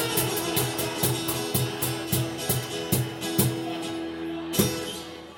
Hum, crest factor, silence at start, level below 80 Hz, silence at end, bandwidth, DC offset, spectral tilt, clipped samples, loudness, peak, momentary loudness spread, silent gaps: none; 20 dB; 0 s; -52 dBFS; 0 s; over 20 kHz; under 0.1%; -4 dB/octave; under 0.1%; -27 LUFS; -6 dBFS; 8 LU; none